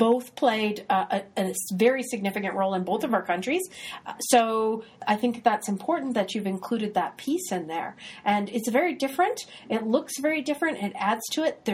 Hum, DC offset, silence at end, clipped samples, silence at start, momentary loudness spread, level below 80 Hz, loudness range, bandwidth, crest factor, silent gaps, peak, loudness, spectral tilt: none; under 0.1%; 0 s; under 0.1%; 0 s; 7 LU; -72 dBFS; 2 LU; 16.5 kHz; 20 dB; none; -6 dBFS; -26 LUFS; -4 dB/octave